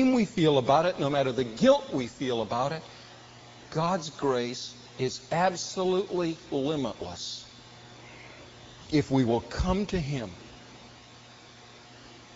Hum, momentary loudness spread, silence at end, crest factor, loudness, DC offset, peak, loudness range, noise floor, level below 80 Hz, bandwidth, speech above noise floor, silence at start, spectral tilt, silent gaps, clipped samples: none; 25 LU; 0 s; 20 dB; -28 LUFS; under 0.1%; -10 dBFS; 5 LU; -51 dBFS; -48 dBFS; 8 kHz; 24 dB; 0 s; -5 dB/octave; none; under 0.1%